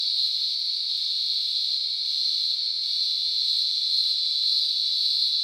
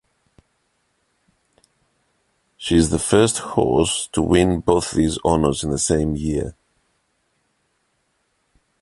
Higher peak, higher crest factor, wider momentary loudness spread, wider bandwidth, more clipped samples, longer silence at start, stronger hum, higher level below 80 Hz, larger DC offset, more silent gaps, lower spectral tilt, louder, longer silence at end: second, -10 dBFS vs -2 dBFS; second, 14 dB vs 20 dB; second, 3 LU vs 7 LU; first, 18 kHz vs 11.5 kHz; neither; second, 0 s vs 2.6 s; neither; second, under -90 dBFS vs -38 dBFS; neither; neither; second, 5 dB/octave vs -5 dB/octave; second, -22 LUFS vs -19 LUFS; second, 0 s vs 2.3 s